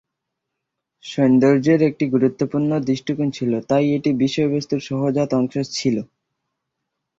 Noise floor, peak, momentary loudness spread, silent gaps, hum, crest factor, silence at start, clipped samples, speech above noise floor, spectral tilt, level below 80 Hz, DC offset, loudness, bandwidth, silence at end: -80 dBFS; -4 dBFS; 8 LU; none; none; 16 dB; 1.05 s; under 0.1%; 61 dB; -6.5 dB/octave; -60 dBFS; under 0.1%; -19 LUFS; 7.8 kHz; 1.15 s